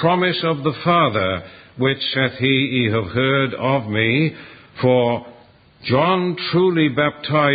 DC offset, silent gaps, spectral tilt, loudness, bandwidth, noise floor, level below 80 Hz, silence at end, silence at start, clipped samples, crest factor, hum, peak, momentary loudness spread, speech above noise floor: under 0.1%; none; -11.5 dB/octave; -18 LUFS; 5 kHz; -48 dBFS; -50 dBFS; 0 s; 0 s; under 0.1%; 16 dB; none; -2 dBFS; 7 LU; 30 dB